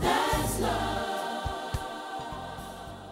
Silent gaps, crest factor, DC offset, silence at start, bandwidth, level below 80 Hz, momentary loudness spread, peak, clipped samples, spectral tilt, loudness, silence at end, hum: none; 18 dB; under 0.1%; 0 s; 16 kHz; -42 dBFS; 13 LU; -12 dBFS; under 0.1%; -4 dB/octave; -31 LUFS; 0 s; none